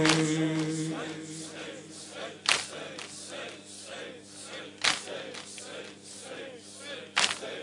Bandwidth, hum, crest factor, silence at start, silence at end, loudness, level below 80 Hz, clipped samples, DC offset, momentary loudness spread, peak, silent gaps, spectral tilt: 11 kHz; none; 30 dB; 0 s; 0 s; -32 LUFS; -72 dBFS; under 0.1%; under 0.1%; 16 LU; -4 dBFS; none; -3 dB/octave